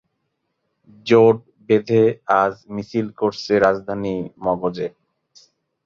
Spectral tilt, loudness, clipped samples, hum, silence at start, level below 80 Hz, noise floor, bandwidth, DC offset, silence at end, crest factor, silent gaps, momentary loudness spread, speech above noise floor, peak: -7 dB/octave; -19 LUFS; under 0.1%; none; 1.05 s; -56 dBFS; -74 dBFS; 7 kHz; under 0.1%; 0.95 s; 18 dB; none; 12 LU; 55 dB; -2 dBFS